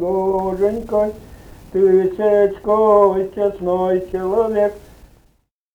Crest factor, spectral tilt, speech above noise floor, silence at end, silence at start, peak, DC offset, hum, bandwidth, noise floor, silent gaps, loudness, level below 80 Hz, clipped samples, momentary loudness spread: 16 dB; -8.5 dB/octave; 43 dB; 0.95 s; 0 s; 0 dBFS; under 0.1%; none; 8.6 kHz; -60 dBFS; none; -17 LUFS; -44 dBFS; under 0.1%; 7 LU